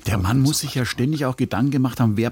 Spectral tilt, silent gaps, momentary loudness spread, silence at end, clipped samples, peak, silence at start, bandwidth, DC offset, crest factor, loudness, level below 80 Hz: -5.5 dB/octave; none; 4 LU; 0 s; under 0.1%; -8 dBFS; 0.05 s; 17 kHz; under 0.1%; 12 dB; -21 LUFS; -42 dBFS